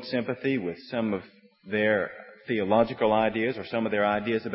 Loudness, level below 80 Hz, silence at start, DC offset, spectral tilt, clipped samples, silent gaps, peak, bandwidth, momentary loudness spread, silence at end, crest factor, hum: -27 LUFS; -62 dBFS; 0 s; under 0.1%; -10 dB/octave; under 0.1%; none; -8 dBFS; 5.8 kHz; 8 LU; 0 s; 18 dB; none